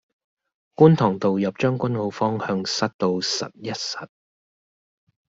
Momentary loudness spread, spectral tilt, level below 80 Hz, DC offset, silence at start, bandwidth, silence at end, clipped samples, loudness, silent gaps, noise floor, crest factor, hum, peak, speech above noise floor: 13 LU; -5.5 dB/octave; -62 dBFS; under 0.1%; 0.8 s; 7.8 kHz; 1.25 s; under 0.1%; -22 LUFS; 2.94-2.99 s; under -90 dBFS; 22 dB; none; -2 dBFS; over 69 dB